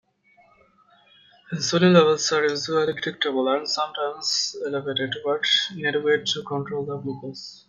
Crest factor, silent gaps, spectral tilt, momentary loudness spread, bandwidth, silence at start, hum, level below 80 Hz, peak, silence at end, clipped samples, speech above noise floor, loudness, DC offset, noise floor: 22 dB; none; -4 dB/octave; 12 LU; 9.2 kHz; 1.5 s; none; -68 dBFS; -2 dBFS; 0.15 s; under 0.1%; 36 dB; -23 LUFS; under 0.1%; -59 dBFS